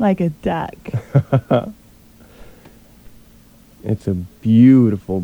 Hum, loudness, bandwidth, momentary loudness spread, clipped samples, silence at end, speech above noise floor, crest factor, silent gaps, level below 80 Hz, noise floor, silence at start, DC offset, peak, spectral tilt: none; -17 LUFS; 8.6 kHz; 15 LU; under 0.1%; 0 s; 32 dB; 16 dB; none; -46 dBFS; -47 dBFS; 0 s; under 0.1%; -2 dBFS; -9.5 dB/octave